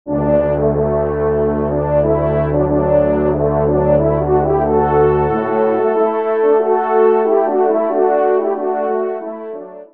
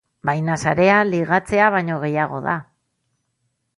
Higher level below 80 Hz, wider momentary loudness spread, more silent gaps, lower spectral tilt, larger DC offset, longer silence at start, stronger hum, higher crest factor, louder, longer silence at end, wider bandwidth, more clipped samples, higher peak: first, -32 dBFS vs -54 dBFS; second, 5 LU vs 9 LU; neither; first, -12.5 dB/octave vs -6.5 dB/octave; first, 0.5% vs under 0.1%; second, 0.05 s vs 0.25 s; neither; second, 12 dB vs 18 dB; first, -15 LUFS vs -19 LUFS; second, 0.1 s vs 1.15 s; second, 3.7 kHz vs 11.5 kHz; neither; about the same, -2 dBFS vs -2 dBFS